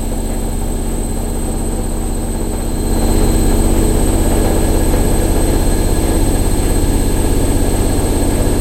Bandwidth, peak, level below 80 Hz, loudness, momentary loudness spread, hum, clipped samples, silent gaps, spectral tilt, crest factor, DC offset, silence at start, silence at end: 16 kHz; 0 dBFS; -16 dBFS; -16 LUFS; 6 LU; none; under 0.1%; none; -5.5 dB/octave; 12 dB; under 0.1%; 0 s; 0 s